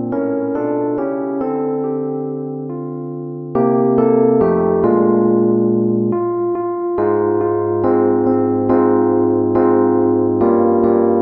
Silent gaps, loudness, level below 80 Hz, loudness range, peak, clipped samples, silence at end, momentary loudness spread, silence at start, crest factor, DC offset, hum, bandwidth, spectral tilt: none; -16 LUFS; -50 dBFS; 6 LU; -2 dBFS; under 0.1%; 0 s; 9 LU; 0 s; 14 dB; under 0.1%; none; 2.7 kHz; -13 dB/octave